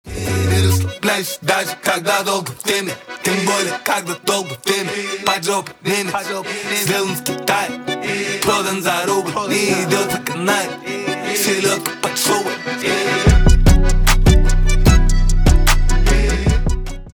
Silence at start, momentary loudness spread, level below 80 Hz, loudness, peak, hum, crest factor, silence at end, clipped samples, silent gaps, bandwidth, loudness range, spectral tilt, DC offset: 0.05 s; 7 LU; -18 dBFS; -17 LUFS; 0 dBFS; none; 16 dB; 0.05 s; under 0.1%; none; 19.5 kHz; 4 LU; -4 dB/octave; under 0.1%